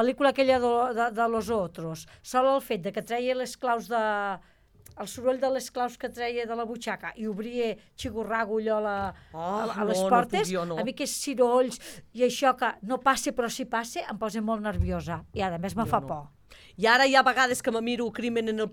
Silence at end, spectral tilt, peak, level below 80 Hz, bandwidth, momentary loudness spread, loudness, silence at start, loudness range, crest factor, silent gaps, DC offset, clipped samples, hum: 0 s; -4 dB/octave; -6 dBFS; -50 dBFS; 18.5 kHz; 11 LU; -27 LUFS; 0 s; 6 LU; 20 dB; none; under 0.1%; under 0.1%; none